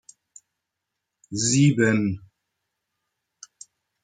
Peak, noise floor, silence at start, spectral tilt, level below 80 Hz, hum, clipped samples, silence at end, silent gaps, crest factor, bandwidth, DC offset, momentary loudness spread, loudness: -8 dBFS; -83 dBFS; 1.3 s; -5 dB/octave; -62 dBFS; none; under 0.1%; 1.85 s; none; 20 dB; 9.4 kHz; under 0.1%; 24 LU; -21 LUFS